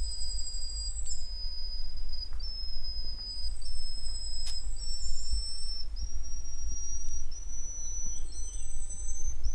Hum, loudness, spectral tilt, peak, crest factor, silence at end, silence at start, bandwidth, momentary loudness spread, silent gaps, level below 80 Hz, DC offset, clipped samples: none; -38 LUFS; -1.5 dB/octave; -14 dBFS; 12 dB; 0 s; 0 s; 9.2 kHz; 5 LU; none; -34 dBFS; under 0.1%; under 0.1%